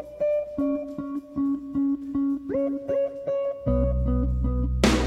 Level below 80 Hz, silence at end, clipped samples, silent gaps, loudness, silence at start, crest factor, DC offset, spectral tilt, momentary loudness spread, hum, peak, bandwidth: -32 dBFS; 0 s; under 0.1%; none; -27 LUFS; 0 s; 18 dB; under 0.1%; -6.5 dB/octave; 4 LU; none; -8 dBFS; 12.5 kHz